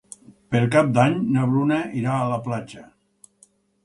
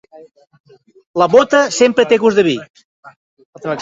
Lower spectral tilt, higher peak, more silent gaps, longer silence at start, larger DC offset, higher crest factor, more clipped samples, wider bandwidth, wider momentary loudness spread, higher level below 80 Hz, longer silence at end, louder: first, -7.5 dB/octave vs -4 dB/octave; about the same, -2 dBFS vs 0 dBFS; second, none vs 2.70-2.74 s, 2.84-3.03 s, 3.16-3.37 s, 3.45-3.53 s; second, 0.5 s vs 1.15 s; neither; about the same, 20 dB vs 16 dB; neither; first, 11.5 kHz vs 7.8 kHz; second, 10 LU vs 13 LU; about the same, -60 dBFS vs -58 dBFS; first, 1 s vs 0 s; second, -21 LUFS vs -13 LUFS